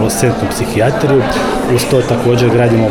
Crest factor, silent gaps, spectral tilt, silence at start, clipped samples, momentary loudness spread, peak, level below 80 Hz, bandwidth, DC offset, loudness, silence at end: 10 dB; none; -5.5 dB/octave; 0 s; under 0.1%; 4 LU; -2 dBFS; -32 dBFS; 18 kHz; under 0.1%; -12 LUFS; 0 s